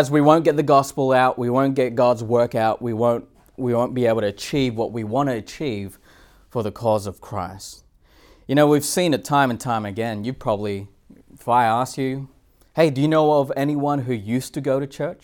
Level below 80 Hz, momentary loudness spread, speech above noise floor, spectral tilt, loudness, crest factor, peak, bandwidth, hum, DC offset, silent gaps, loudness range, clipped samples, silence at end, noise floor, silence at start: -54 dBFS; 13 LU; 33 dB; -6 dB/octave; -21 LUFS; 20 dB; -2 dBFS; 19 kHz; none; under 0.1%; none; 5 LU; under 0.1%; 0.1 s; -53 dBFS; 0 s